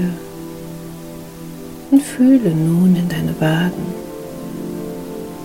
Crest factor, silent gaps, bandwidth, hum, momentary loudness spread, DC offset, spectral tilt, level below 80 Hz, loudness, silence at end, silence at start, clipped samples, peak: 16 dB; none; 16.5 kHz; none; 19 LU; under 0.1%; -7 dB/octave; -46 dBFS; -17 LUFS; 0 s; 0 s; under 0.1%; -2 dBFS